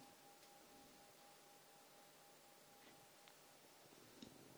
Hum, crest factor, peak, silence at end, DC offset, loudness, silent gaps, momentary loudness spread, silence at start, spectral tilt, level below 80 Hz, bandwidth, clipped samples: none; 22 dB; -42 dBFS; 0 s; under 0.1%; -64 LUFS; none; 3 LU; 0 s; -2.5 dB/octave; under -90 dBFS; over 20 kHz; under 0.1%